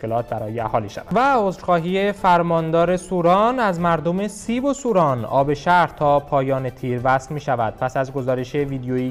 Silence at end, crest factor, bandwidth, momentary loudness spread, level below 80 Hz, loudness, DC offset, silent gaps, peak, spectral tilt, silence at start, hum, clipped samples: 0 s; 14 dB; 15.5 kHz; 7 LU; -46 dBFS; -20 LUFS; under 0.1%; none; -6 dBFS; -6.5 dB/octave; 0 s; none; under 0.1%